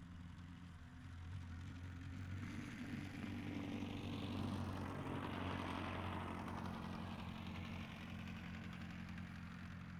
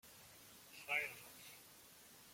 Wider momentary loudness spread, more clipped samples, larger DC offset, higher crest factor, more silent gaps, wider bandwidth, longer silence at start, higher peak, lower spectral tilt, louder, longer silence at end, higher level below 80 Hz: second, 9 LU vs 19 LU; neither; neither; second, 16 dB vs 24 dB; neither; about the same, 15.5 kHz vs 16.5 kHz; about the same, 0 s vs 0.05 s; second, -32 dBFS vs -26 dBFS; first, -6.5 dB/octave vs -1 dB/octave; second, -49 LUFS vs -45 LUFS; about the same, 0 s vs 0 s; first, -64 dBFS vs -84 dBFS